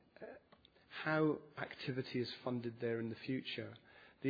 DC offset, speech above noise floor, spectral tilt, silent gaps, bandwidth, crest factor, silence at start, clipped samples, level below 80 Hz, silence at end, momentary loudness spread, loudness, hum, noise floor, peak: under 0.1%; 27 dB; -4.5 dB/octave; none; 5 kHz; 18 dB; 0.2 s; under 0.1%; -80 dBFS; 0 s; 19 LU; -41 LUFS; none; -68 dBFS; -24 dBFS